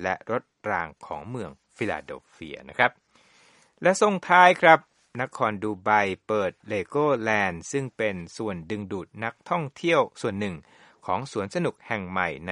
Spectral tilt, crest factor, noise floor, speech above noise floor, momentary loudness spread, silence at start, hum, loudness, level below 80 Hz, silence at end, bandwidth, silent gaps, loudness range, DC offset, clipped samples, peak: -5 dB/octave; 26 dB; -59 dBFS; 34 dB; 16 LU; 0 s; none; -25 LUFS; -62 dBFS; 0 s; 11.5 kHz; none; 8 LU; under 0.1%; under 0.1%; 0 dBFS